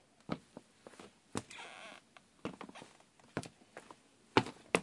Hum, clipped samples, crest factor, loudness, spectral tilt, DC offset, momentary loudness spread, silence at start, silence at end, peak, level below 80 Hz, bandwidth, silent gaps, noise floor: none; under 0.1%; 34 dB; -41 LUFS; -4.5 dB/octave; under 0.1%; 24 LU; 0.3 s; 0 s; -10 dBFS; -74 dBFS; 11.5 kHz; none; -64 dBFS